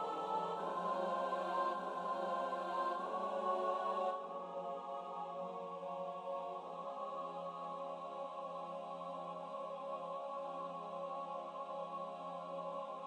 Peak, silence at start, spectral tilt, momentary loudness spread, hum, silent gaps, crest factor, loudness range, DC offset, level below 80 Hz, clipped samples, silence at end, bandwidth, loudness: -26 dBFS; 0 s; -5.5 dB/octave; 8 LU; none; none; 16 dB; 6 LU; under 0.1%; under -90 dBFS; under 0.1%; 0 s; 10.5 kHz; -42 LUFS